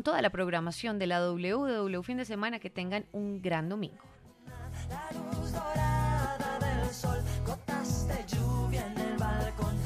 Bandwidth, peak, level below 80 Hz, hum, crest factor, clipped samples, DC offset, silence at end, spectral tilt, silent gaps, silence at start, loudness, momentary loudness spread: 15.5 kHz; -14 dBFS; -42 dBFS; none; 18 dB; under 0.1%; under 0.1%; 0 s; -6 dB/octave; none; 0 s; -33 LUFS; 9 LU